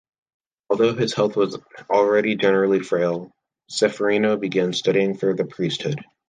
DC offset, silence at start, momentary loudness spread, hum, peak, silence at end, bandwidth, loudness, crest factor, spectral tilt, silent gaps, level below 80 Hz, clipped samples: under 0.1%; 0.7 s; 8 LU; none; -4 dBFS; 0.25 s; 9.8 kHz; -21 LUFS; 16 dB; -5.5 dB/octave; none; -66 dBFS; under 0.1%